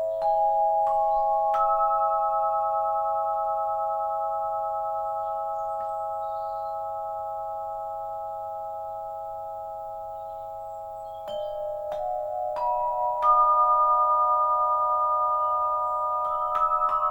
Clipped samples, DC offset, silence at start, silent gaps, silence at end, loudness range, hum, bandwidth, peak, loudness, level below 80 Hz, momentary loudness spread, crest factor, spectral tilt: under 0.1%; under 0.1%; 0 s; none; 0 s; 12 LU; none; 17 kHz; -10 dBFS; -26 LUFS; -58 dBFS; 14 LU; 16 dB; -5 dB/octave